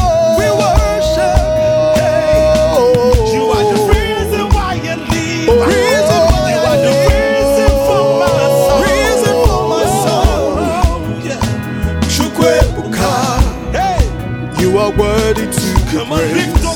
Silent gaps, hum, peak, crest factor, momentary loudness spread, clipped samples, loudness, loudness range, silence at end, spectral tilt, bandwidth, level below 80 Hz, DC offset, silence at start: none; none; 0 dBFS; 12 dB; 6 LU; 0.1%; -12 LUFS; 3 LU; 0 s; -5 dB/octave; 19.5 kHz; -20 dBFS; under 0.1%; 0 s